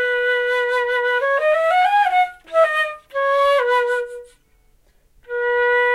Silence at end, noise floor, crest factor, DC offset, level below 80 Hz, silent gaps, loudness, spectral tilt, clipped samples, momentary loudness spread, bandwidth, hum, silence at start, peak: 0 s; -56 dBFS; 14 dB; under 0.1%; -58 dBFS; none; -18 LUFS; 0 dB/octave; under 0.1%; 8 LU; 13 kHz; none; 0 s; -4 dBFS